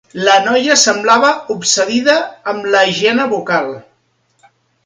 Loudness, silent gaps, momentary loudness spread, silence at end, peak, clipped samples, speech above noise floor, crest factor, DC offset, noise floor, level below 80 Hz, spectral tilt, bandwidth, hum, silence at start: -12 LUFS; none; 8 LU; 1.05 s; 0 dBFS; under 0.1%; 47 dB; 14 dB; under 0.1%; -60 dBFS; -62 dBFS; -2 dB/octave; 16 kHz; none; 0.15 s